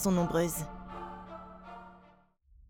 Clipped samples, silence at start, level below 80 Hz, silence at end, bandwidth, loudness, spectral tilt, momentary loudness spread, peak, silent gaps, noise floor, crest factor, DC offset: under 0.1%; 0 s; -54 dBFS; 0.05 s; 20 kHz; -34 LUFS; -5.5 dB/octave; 21 LU; -16 dBFS; none; -63 dBFS; 18 dB; under 0.1%